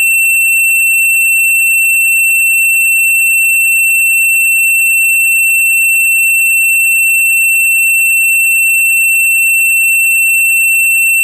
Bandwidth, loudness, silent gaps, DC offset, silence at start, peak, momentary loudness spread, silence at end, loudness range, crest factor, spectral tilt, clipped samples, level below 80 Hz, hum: 14 kHz; -6 LUFS; none; under 0.1%; 0 s; -6 dBFS; 0 LU; 0 s; 0 LU; 2 dB; 16 dB/octave; under 0.1%; under -90 dBFS; none